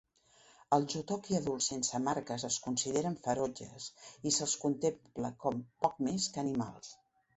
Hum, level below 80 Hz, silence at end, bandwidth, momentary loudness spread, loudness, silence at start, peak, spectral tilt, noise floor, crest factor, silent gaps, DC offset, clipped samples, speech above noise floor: none; -68 dBFS; 0.4 s; 8.2 kHz; 10 LU; -35 LUFS; 0.7 s; -14 dBFS; -4 dB/octave; -65 dBFS; 22 dB; none; under 0.1%; under 0.1%; 30 dB